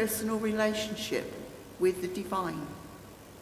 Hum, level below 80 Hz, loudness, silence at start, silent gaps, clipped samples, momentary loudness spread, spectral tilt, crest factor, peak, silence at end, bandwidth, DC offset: none; -58 dBFS; -32 LUFS; 0 s; none; under 0.1%; 17 LU; -4 dB/octave; 16 dB; -16 dBFS; 0 s; 16 kHz; under 0.1%